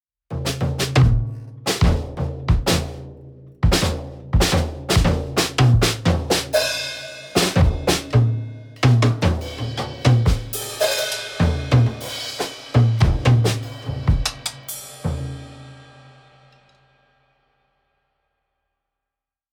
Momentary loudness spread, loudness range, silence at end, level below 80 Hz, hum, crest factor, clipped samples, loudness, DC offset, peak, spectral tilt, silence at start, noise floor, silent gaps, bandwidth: 13 LU; 9 LU; 3.7 s; -28 dBFS; none; 18 dB; under 0.1%; -20 LUFS; under 0.1%; -2 dBFS; -5 dB/octave; 0.3 s; -86 dBFS; none; 20 kHz